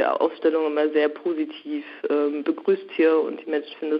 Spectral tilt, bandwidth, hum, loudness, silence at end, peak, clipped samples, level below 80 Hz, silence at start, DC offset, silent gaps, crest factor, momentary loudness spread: -7.5 dB/octave; 5.4 kHz; none; -24 LUFS; 0 s; -8 dBFS; under 0.1%; -82 dBFS; 0 s; under 0.1%; none; 14 dB; 9 LU